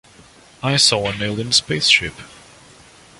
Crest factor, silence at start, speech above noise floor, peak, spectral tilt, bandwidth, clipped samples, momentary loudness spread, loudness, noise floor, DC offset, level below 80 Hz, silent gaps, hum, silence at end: 20 dB; 0.6 s; 29 dB; 0 dBFS; -2.5 dB/octave; 11.5 kHz; under 0.1%; 11 LU; -16 LUFS; -47 dBFS; under 0.1%; -48 dBFS; none; none; 0.85 s